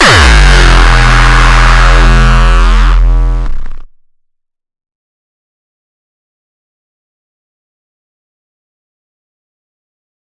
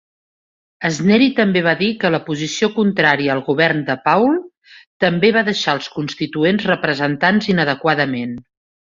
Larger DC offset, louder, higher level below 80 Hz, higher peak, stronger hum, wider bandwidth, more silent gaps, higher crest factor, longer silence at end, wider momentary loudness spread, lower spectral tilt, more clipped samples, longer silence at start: neither; first, -7 LUFS vs -16 LUFS; first, -10 dBFS vs -58 dBFS; about the same, 0 dBFS vs 0 dBFS; neither; first, 11.5 kHz vs 7.6 kHz; second, none vs 4.57-4.61 s, 4.87-5.00 s; second, 8 dB vs 18 dB; first, 6.4 s vs 0.45 s; about the same, 10 LU vs 9 LU; second, -4 dB/octave vs -5.5 dB/octave; first, 0.9% vs under 0.1%; second, 0 s vs 0.8 s